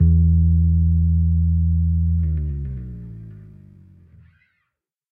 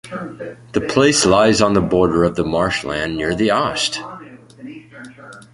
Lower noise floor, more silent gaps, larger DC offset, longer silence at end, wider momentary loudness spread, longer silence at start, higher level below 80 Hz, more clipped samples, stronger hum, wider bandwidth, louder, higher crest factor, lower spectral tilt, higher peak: first, -78 dBFS vs -39 dBFS; neither; neither; first, 1.65 s vs 0.15 s; second, 20 LU vs 24 LU; about the same, 0 s vs 0.05 s; first, -24 dBFS vs -42 dBFS; neither; neither; second, 0.6 kHz vs 11.5 kHz; second, -19 LUFS vs -16 LUFS; second, 12 dB vs 18 dB; first, -14 dB/octave vs -4 dB/octave; second, -6 dBFS vs 0 dBFS